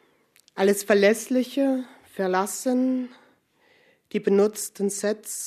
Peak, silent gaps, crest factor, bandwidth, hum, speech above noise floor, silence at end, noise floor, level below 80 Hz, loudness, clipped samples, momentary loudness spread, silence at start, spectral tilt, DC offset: -6 dBFS; none; 20 dB; 14 kHz; none; 39 dB; 0 s; -62 dBFS; -76 dBFS; -24 LUFS; under 0.1%; 11 LU; 0.55 s; -4.5 dB/octave; under 0.1%